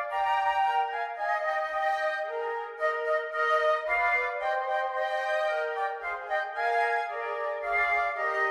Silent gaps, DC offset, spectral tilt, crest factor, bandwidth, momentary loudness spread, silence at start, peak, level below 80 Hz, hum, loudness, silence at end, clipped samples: none; under 0.1%; -1.5 dB/octave; 14 dB; 12 kHz; 7 LU; 0 s; -14 dBFS; -64 dBFS; none; -28 LUFS; 0 s; under 0.1%